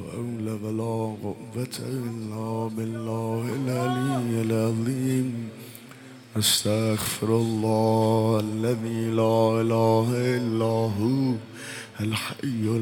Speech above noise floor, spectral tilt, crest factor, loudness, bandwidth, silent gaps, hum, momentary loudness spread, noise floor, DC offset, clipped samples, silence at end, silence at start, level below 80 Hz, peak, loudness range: 20 dB; -5.5 dB/octave; 16 dB; -25 LUFS; 17 kHz; none; none; 12 LU; -45 dBFS; under 0.1%; under 0.1%; 0 s; 0 s; -64 dBFS; -10 dBFS; 6 LU